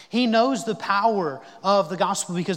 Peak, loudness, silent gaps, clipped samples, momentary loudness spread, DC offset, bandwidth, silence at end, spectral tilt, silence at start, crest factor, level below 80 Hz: -6 dBFS; -22 LUFS; none; under 0.1%; 7 LU; under 0.1%; 16.5 kHz; 0 s; -4.5 dB/octave; 0 s; 16 dB; -76 dBFS